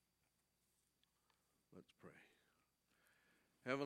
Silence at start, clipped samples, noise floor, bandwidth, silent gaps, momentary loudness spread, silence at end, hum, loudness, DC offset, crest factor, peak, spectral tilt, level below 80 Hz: 1.7 s; under 0.1%; -86 dBFS; 14 kHz; none; 17 LU; 0 s; none; -54 LUFS; under 0.1%; 30 dB; -26 dBFS; -5.5 dB/octave; under -90 dBFS